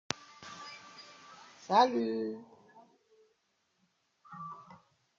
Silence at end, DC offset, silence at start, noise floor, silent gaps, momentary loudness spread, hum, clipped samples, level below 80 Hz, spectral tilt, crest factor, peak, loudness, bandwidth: 0.45 s; under 0.1%; 0.4 s; -77 dBFS; none; 25 LU; none; under 0.1%; -82 dBFS; -4 dB/octave; 30 dB; -8 dBFS; -31 LUFS; 7.8 kHz